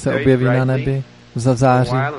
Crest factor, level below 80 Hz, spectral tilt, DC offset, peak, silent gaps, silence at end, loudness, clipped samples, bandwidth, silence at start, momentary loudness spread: 14 dB; -42 dBFS; -7.5 dB/octave; under 0.1%; -2 dBFS; none; 0 s; -16 LUFS; under 0.1%; 11 kHz; 0 s; 9 LU